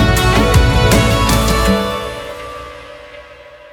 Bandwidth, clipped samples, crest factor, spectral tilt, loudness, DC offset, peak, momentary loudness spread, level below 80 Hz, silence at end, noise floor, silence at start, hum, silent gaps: 18.5 kHz; under 0.1%; 14 dB; -5 dB/octave; -13 LUFS; under 0.1%; 0 dBFS; 22 LU; -20 dBFS; 0.15 s; -38 dBFS; 0 s; none; none